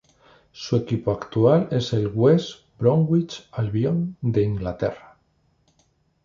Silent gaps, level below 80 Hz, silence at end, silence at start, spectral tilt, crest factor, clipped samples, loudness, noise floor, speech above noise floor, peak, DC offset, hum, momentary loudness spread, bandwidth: none; -50 dBFS; 1.25 s; 0.55 s; -8 dB/octave; 18 dB; under 0.1%; -22 LUFS; -65 dBFS; 44 dB; -4 dBFS; under 0.1%; none; 10 LU; 7.4 kHz